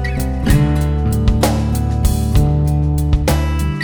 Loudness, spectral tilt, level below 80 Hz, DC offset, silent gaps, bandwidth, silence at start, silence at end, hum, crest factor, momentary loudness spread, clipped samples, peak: -16 LUFS; -6.5 dB/octave; -18 dBFS; under 0.1%; none; over 20 kHz; 0 s; 0 s; none; 14 dB; 3 LU; under 0.1%; 0 dBFS